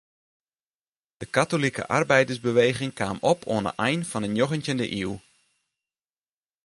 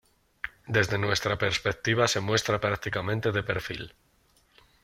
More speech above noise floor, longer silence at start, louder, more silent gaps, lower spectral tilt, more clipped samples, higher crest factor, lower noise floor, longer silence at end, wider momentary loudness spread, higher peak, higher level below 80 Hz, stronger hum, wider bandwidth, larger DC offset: first, over 66 dB vs 38 dB; first, 1.2 s vs 0.45 s; about the same, -25 LUFS vs -27 LUFS; neither; about the same, -5 dB/octave vs -4 dB/octave; neither; about the same, 22 dB vs 22 dB; first, under -90 dBFS vs -65 dBFS; first, 1.45 s vs 0.95 s; second, 8 LU vs 14 LU; about the same, -6 dBFS vs -8 dBFS; about the same, -58 dBFS vs -54 dBFS; neither; second, 11.5 kHz vs 15.5 kHz; neither